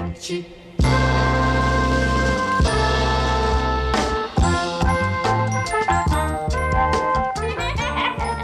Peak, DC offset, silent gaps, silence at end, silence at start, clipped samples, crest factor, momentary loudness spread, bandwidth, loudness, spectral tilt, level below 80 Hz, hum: -6 dBFS; under 0.1%; none; 0 s; 0 s; under 0.1%; 14 dB; 5 LU; 12 kHz; -20 LUFS; -5.5 dB/octave; -26 dBFS; none